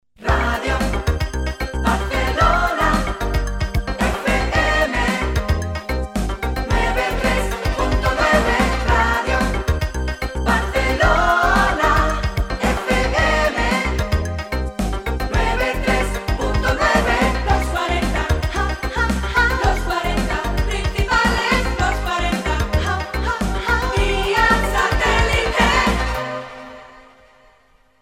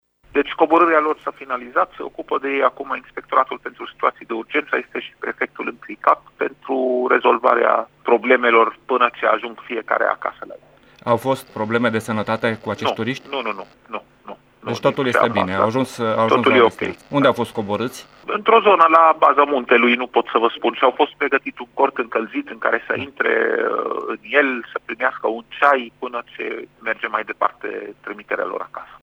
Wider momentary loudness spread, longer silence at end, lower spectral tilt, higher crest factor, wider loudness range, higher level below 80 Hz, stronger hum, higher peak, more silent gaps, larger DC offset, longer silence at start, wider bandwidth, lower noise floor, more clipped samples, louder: second, 8 LU vs 14 LU; first, 1 s vs 0.05 s; about the same, -5 dB/octave vs -5.5 dB/octave; about the same, 18 dB vs 20 dB; second, 3 LU vs 7 LU; first, -24 dBFS vs -62 dBFS; neither; about the same, 0 dBFS vs 0 dBFS; neither; neither; second, 0.2 s vs 0.35 s; about the same, 16 kHz vs 15 kHz; first, -56 dBFS vs -40 dBFS; neither; about the same, -19 LUFS vs -19 LUFS